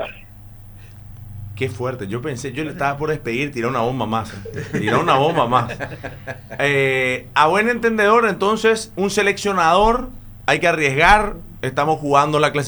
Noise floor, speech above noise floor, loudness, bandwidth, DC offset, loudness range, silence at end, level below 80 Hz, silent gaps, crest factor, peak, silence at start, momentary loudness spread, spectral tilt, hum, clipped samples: -39 dBFS; 21 dB; -18 LUFS; over 20 kHz; under 0.1%; 7 LU; 0 s; -38 dBFS; none; 18 dB; 0 dBFS; 0 s; 16 LU; -5 dB/octave; none; under 0.1%